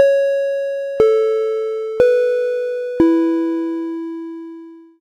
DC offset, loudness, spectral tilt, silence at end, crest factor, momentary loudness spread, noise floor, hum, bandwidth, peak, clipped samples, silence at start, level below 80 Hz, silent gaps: under 0.1%; -17 LUFS; -6.5 dB/octave; 0.2 s; 16 dB; 15 LU; -37 dBFS; none; 9.8 kHz; 0 dBFS; under 0.1%; 0 s; -52 dBFS; none